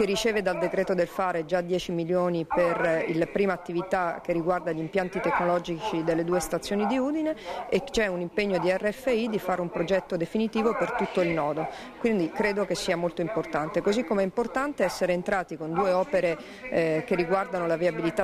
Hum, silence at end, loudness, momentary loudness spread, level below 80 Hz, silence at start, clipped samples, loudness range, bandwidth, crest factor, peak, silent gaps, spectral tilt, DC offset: none; 0 s; -27 LUFS; 4 LU; -54 dBFS; 0 s; under 0.1%; 1 LU; 15.5 kHz; 14 dB; -12 dBFS; none; -5.5 dB/octave; under 0.1%